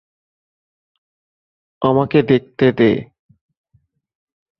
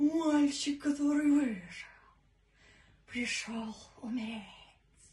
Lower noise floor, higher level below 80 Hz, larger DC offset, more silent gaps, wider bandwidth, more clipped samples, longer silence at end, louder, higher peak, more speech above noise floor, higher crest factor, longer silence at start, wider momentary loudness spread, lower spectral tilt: second, -61 dBFS vs -67 dBFS; first, -54 dBFS vs -66 dBFS; neither; neither; second, 6 kHz vs 11.5 kHz; neither; first, 1.55 s vs 0.5 s; first, -16 LUFS vs -33 LUFS; first, -2 dBFS vs -20 dBFS; first, 47 dB vs 34 dB; about the same, 18 dB vs 14 dB; first, 1.8 s vs 0 s; second, 6 LU vs 18 LU; first, -9.5 dB/octave vs -3.5 dB/octave